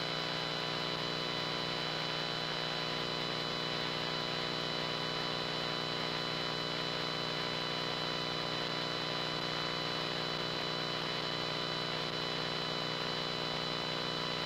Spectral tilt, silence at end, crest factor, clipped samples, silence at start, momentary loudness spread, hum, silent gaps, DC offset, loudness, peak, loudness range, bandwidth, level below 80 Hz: -3.5 dB/octave; 0 s; 14 dB; under 0.1%; 0 s; 0 LU; 60 Hz at -50 dBFS; none; under 0.1%; -35 LUFS; -22 dBFS; 0 LU; 16 kHz; -62 dBFS